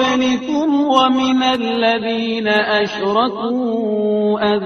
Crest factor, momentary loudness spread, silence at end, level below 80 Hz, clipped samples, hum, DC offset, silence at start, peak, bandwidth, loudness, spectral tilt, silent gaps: 16 dB; 5 LU; 0 s; -54 dBFS; under 0.1%; none; under 0.1%; 0 s; 0 dBFS; 6.8 kHz; -16 LUFS; -4.5 dB/octave; none